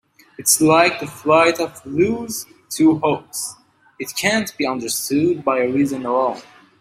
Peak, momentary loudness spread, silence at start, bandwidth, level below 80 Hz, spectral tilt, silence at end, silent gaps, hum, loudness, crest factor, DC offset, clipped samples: -2 dBFS; 13 LU; 0.4 s; 16 kHz; -60 dBFS; -3.5 dB/octave; 0.4 s; none; none; -18 LUFS; 18 dB; under 0.1%; under 0.1%